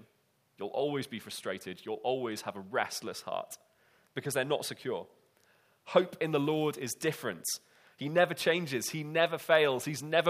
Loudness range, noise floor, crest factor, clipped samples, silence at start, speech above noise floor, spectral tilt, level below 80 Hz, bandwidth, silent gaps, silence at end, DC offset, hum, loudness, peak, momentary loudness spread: 6 LU; -72 dBFS; 24 dB; under 0.1%; 0.6 s; 40 dB; -4 dB/octave; -80 dBFS; 15.5 kHz; none; 0 s; under 0.1%; none; -32 LUFS; -10 dBFS; 12 LU